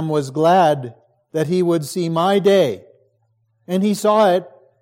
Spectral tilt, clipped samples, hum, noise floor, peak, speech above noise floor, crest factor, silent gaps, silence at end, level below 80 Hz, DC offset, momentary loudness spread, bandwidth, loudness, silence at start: -6 dB/octave; under 0.1%; none; -64 dBFS; -4 dBFS; 48 dB; 14 dB; none; 0.35 s; -68 dBFS; under 0.1%; 10 LU; 16.5 kHz; -17 LUFS; 0 s